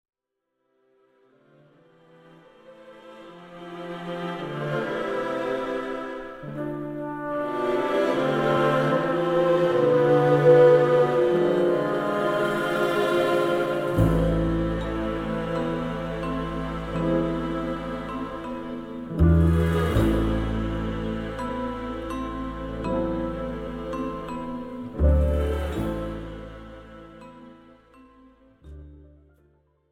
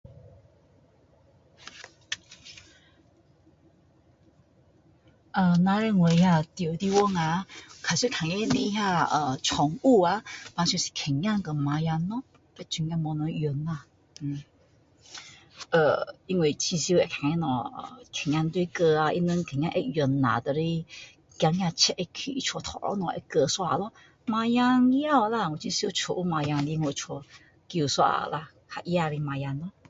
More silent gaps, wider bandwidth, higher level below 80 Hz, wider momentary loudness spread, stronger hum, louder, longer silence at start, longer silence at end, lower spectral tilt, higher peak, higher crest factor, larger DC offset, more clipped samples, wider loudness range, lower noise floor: neither; first, 15.5 kHz vs 8 kHz; first, -36 dBFS vs -58 dBFS; about the same, 15 LU vs 16 LU; neither; about the same, -24 LUFS vs -26 LUFS; first, 2.7 s vs 0.1 s; first, 0.85 s vs 0.2 s; first, -7.5 dB/octave vs -5 dB/octave; first, -4 dBFS vs -8 dBFS; about the same, 20 dB vs 20 dB; neither; neither; first, 12 LU vs 9 LU; first, -80 dBFS vs -61 dBFS